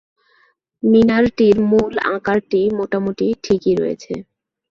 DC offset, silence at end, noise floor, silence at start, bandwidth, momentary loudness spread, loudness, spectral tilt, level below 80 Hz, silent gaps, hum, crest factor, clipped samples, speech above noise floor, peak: under 0.1%; 0.5 s; -59 dBFS; 0.85 s; 7.2 kHz; 10 LU; -17 LUFS; -7 dB/octave; -48 dBFS; none; none; 16 dB; under 0.1%; 43 dB; -2 dBFS